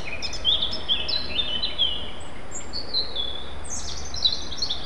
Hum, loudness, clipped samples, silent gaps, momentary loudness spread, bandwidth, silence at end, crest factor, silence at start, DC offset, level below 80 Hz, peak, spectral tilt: none; -25 LUFS; under 0.1%; none; 12 LU; 12 kHz; 0 s; 20 dB; 0 s; 5%; -42 dBFS; -8 dBFS; -1.5 dB/octave